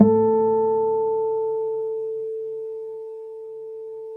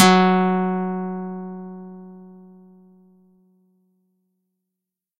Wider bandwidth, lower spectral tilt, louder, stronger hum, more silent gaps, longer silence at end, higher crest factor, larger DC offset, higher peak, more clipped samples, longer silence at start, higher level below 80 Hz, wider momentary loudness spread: second, 1.9 kHz vs 13 kHz; first, -12.5 dB/octave vs -5 dB/octave; about the same, -23 LUFS vs -21 LUFS; neither; neither; second, 0 s vs 2.85 s; about the same, 20 dB vs 24 dB; neither; about the same, -2 dBFS vs 0 dBFS; neither; about the same, 0 s vs 0 s; about the same, -66 dBFS vs -66 dBFS; second, 17 LU vs 25 LU